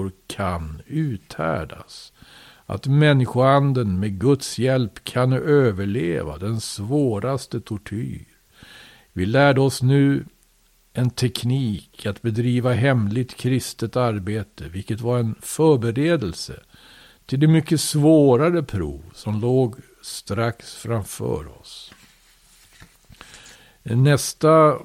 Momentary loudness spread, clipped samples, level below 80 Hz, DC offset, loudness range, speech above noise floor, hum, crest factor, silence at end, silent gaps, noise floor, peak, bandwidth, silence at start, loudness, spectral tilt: 16 LU; under 0.1%; -48 dBFS; under 0.1%; 7 LU; 39 dB; none; 18 dB; 0 s; none; -59 dBFS; -4 dBFS; 15.5 kHz; 0 s; -21 LUFS; -6.5 dB/octave